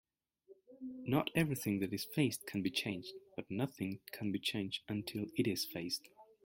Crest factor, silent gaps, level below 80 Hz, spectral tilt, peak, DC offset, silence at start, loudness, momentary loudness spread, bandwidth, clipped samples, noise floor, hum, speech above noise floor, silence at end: 22 dB; none; -72 dBFS; -5 dB/octave; -18 dBFS; under 0.1%; 0.5 s; -38 LUFS; 10 LU; 16.5 kHz; under 0.1%; -66 dBFS; none; 27 dB; 0.2 s